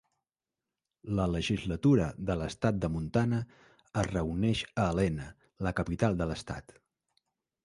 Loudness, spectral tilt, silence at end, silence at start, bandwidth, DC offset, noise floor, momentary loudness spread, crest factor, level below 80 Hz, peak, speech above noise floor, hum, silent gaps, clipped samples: -31 LUFS; -6.5 dB/octave; 1.05 s; 1.05 s; 11.5 kHz; under 0.1%; under -90 dBFS; 12 LU; 20 dB; -48 dBFS; -12 dBFS; over 60 dB; none; none; under 0.1%